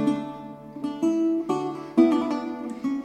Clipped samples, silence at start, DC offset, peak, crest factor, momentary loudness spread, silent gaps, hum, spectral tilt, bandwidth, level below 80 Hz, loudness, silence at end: under 0.1%; 0 s; under 0.1%; -6 dBFS; 18 dB; 15 LU; none; none; -6.5 dB/octave; 9.2 kHz; -64 dBFS; -25 LUFS; 0 s